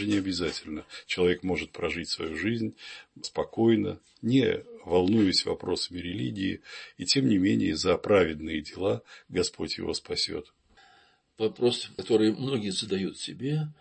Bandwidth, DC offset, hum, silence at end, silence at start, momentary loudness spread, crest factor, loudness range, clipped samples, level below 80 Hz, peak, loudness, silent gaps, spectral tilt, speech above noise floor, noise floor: 8.8 kHz; under 0.1%; none; 0.1 s; 0 s; 11 LU; 18 dB; 4 LU; under 0.1%; -56 dBFS; -10 dBFS; -28 LUFS; none; -5 dB/octave; 34 dB; -62 dBFS